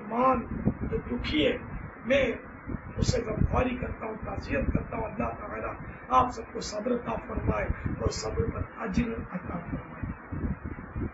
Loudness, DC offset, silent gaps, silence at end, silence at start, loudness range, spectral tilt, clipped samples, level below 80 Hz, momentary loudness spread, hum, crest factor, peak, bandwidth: -31 LUFS; under 0.1%; none; 0 s; 0 s; 3 LU; -6 dB/octave; under 0.1%; -40 dBFS; 12 LU; none; 22 dB; -8 dBFS; 8 kHz